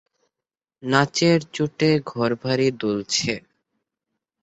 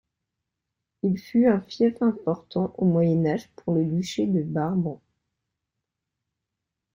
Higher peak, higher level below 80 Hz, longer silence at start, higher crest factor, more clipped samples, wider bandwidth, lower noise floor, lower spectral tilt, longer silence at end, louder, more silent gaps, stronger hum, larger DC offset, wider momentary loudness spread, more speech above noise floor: first, -2 dBFS vs -8 dBFS; about the same, -60 dBFS vs -64 dBFS; second, 0.8 s vs 1.05 s; about the same, 22 dB vs 18 dB; neither; second, 8.2 kHz vs 15.5 kHz; first, -89 dBFS vs -84 dBFS; second, -4.5 dB/octave vs -8 dB/octave; second, 1.05 s vs 2 s; first, -21 LUFS vs -25 LUFS; neither; neither; neither; about the same, 8 LU vs 8 LU; first, 68 dB vs 61 dB